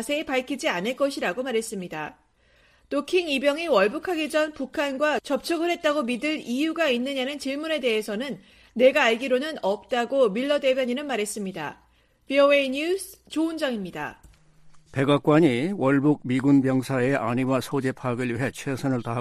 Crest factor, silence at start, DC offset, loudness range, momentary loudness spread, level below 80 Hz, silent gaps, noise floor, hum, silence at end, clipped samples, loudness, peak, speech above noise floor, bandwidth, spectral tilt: 18 dB; 0 s; under 0.1%; 3 LU; 11 LU; -60 dBFS; none; -60 dBFS; none; 0 s; under 0.1%; -24 LUFS; -6 dBFS; 36 dB; 15 kHz; -5.5 dB/octave